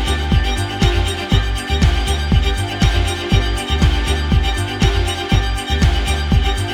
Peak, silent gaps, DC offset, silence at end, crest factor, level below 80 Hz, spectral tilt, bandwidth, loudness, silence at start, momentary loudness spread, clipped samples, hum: -2 dBFS; none; under 0.1%; 0 s; 14 dB; -18 dBFS; -5 dB/octave; 15.5 kHz; -17 LUFS; 0 s; 3 LU; under 0.1%; none